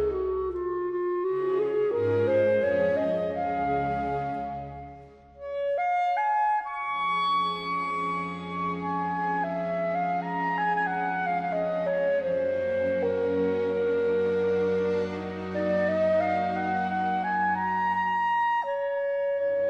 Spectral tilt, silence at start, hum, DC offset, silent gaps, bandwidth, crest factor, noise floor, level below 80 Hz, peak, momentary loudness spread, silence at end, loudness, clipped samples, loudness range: -7.5 dB/octave; 0 s; none; under 0.1%; none; 8.4 kHz; 14 dB; -48 dBFS; -56 dBFS; -14 dBFS; 6 LU; 0 s; -27 LUFS; under 0.1%; 3 LU